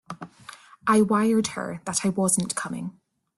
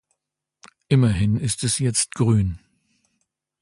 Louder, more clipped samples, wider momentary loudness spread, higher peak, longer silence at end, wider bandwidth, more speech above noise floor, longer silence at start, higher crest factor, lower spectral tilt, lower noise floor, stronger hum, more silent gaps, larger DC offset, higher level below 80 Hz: second, -24 LUFS vs -21 LUFS; neither; first, 20 LU vs 4 LU; about the same, -8 dBFS vs -6 dBFS; second, 0.45 s vs 1.05 s; about the same, 12.5 kHz vs 11.5 kHz; second, 24 dB vs 62 dB; second, 0.1 s vs 0.9 s; about the same, 18 dB vs 16 dB; about the same, -4.5 dB/octave vs -5 dB/octave; second, -47 dBFS vs -82 dBFS; neither; neither; neither; second, -62 dBFS vs -42 dBFS